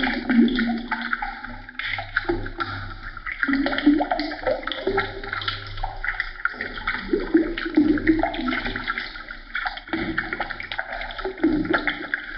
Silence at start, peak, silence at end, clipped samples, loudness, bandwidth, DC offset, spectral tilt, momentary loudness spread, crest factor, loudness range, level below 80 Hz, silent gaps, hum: 0 s; -6 dBFS; 0 s; under 0.1%; -25 LUFS; 5.8 kHz; under 0.1%; -3 dB/octave; 11 LU; 18 dB; 3 LU; -38 dBFS; none; none